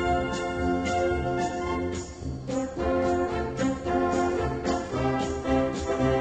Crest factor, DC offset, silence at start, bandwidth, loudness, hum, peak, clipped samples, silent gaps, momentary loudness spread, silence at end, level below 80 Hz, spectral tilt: 14 dB; under 0.1%; 0 s; 9.2 kHz; -28 LUFS; none; -12 dBFS; under 0.1%; none; 6 LU; 0 s; -40 dBFS; -6 dB/octave